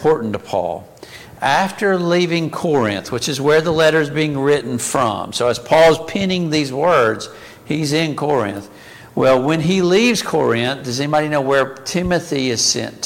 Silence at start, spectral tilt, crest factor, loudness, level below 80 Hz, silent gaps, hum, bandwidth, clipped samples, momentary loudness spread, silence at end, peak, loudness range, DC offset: 0 s; -4.5 dB/octave; 16 dB; -17 LUFS; -48 dBFS; none; none; 17 kHz; under 0.1%; 8 LU; 0 s; -2 dBFS; 3 LU; under 0.1%